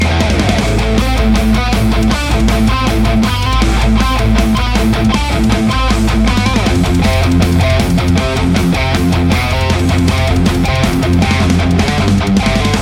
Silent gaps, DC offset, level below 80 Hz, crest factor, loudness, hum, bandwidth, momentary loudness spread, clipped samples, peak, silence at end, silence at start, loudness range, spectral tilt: none; under 0.1%; -16 dBFS; 10 dB; -12 LUFS; none; 16.5 kHz; 1 LU; under 0.1%; 0 dBFS; 0 s; 0 s; 0 LU; -5.5 dB/octave